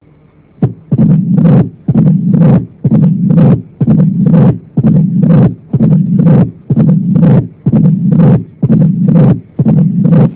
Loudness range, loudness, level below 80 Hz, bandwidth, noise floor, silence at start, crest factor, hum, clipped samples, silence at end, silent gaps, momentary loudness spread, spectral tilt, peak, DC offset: 0 LU; -9 LUFS; -36 dBFS; 4 kHz; -43 dBFS; 0.6 s; 8 dB; none; 3%; 0 s; none; 5 LU; -14 dB/octave; 0 dBFS; under 0.1%